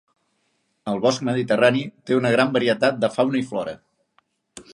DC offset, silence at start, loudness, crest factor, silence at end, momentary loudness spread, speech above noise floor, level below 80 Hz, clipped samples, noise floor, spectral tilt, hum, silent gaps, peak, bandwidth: under 0.1%; 0.85 s; -21 LUFS; 20 dB; 0.1 s; 11 LU; 49 dB; -66 dBFS; under 0.1%; -70 dBFS; -5.5 dB/octave; none; none; -4 dBFS; 11.5 kHz